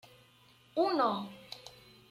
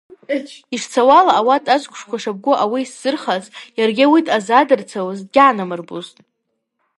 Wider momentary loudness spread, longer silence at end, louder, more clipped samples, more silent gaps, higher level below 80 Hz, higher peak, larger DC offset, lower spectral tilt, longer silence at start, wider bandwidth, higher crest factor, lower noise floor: first, 19 LU vs 16 LU; second, 0.4 s vs 0.9 s; second, -33 LUFS vs -16 LUFS; neither; neither; second, -76 dBFS vs -68 dBFS; second, -16 dBFS vs 0 dBFS; neither; first, -5.5 dB/octave vs -4 dB/octave; first, 0.75 s vs 0.3 s; first, 15.5 kHz vs 11.5 kHz; about the same, 20 dB vs 16 dB; second, -63 dBFS vs -73 dBFS